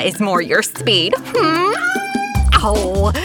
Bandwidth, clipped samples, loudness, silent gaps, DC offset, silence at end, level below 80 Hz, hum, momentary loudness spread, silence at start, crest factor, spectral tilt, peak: 19.5 kHz; under 0.1%; -16 LUFS; none; under 0.1%; 0 s; -24 dBFS; none; 4 LU; 0 s; 14 dB; -4 dB/octave; -2 dBFS